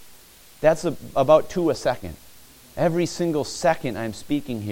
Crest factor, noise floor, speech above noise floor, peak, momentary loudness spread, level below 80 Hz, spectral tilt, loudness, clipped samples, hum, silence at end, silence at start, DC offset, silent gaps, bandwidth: 20 dB; -48 dBFS; 26 dB; -2 dBFS; 12 LU; -50 dBFS; -5.5 dB/octave; -23 LUFS; under 0.1%; none; 0 s; 0 s; under 0.1%; none; 17 kHz